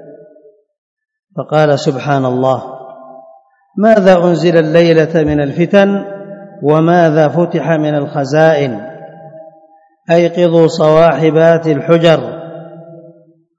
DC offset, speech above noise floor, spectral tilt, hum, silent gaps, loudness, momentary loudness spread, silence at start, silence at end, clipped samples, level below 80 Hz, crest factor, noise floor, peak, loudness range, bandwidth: under 0.1%; 37 dB; -7 dB/octave; none; 0.78-0.97 s; -11 LUFS; 18 LU; 0.05 s; 0.6 s; 0.6%; -46 dBFS; 12 dB; -47 dBFS; 0 dBFS; 4 LU; 7.8 kHz